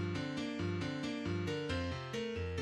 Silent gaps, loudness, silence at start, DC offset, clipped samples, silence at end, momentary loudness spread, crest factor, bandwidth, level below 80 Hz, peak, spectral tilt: none; -39 LUFS; 0 s; under 0.1%; under 0.1%; 0 s; 2 LU; 14 dB; 11.5 kHz; -56 dBFS; -24 dBFS; -6 dB/octave